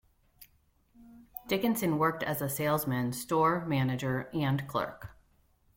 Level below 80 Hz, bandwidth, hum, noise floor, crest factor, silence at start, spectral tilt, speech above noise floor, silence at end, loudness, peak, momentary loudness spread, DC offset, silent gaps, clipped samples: -62 dBFS; 17 kHz; none; -68 dBFS; 18 dB; 0.4 s; -5.5 dB/octave; 38 dB; 0.65 s; -31 LUFS; -14 dBFS; 11 LU; under 0.1%; none; under 0.1%